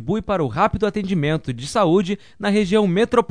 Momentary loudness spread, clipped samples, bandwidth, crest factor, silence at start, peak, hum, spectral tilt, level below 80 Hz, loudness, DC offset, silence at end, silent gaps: 6 LU; under 0.1%; 11 kHz; 18 dB; 0 s; -2 dBFS; none; -6.5 dB/octave; -42 dBFS; -20 LUFS; 0.4%; 0.05 s; none